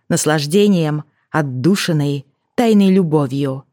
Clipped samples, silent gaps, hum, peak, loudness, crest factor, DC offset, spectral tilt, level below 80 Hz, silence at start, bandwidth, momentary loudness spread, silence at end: under 0.1%; none; none; 0 dBFS; -16 LUFS; 16 dB; under 0.1%; -6 dB/octave; -62 dBFS; 0.1 s; 17.5 kHz; 10 LU; 0.1 s